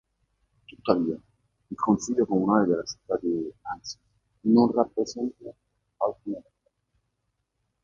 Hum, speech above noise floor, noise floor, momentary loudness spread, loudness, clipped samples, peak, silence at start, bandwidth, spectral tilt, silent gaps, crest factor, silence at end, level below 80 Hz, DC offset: none; 52 dB; -78 dBFS; 17 LU; -26 LUFS; under 0.1%; -4 dBFS; 0.7 s; 7.6 kHz; -6 dB/octave; none; 24 dB; 1.4 s; -62 dBFS; under 0.1%